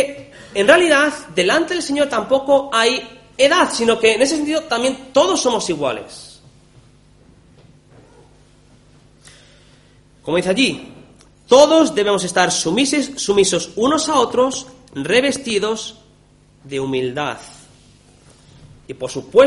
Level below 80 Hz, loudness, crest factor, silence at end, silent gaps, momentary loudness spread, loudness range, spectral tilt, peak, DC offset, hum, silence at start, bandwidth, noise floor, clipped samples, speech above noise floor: -52 dBFS; -16 LUFS; 18 dB; 0 s; none; 16 LU; 11 LU; -3 dB/octave; 0 dBFS; under 0.1%; 50 Hz at -55 dBFS; 0 s; 11.5 kHz; -51 dBFS; under 0.1%; 35 dB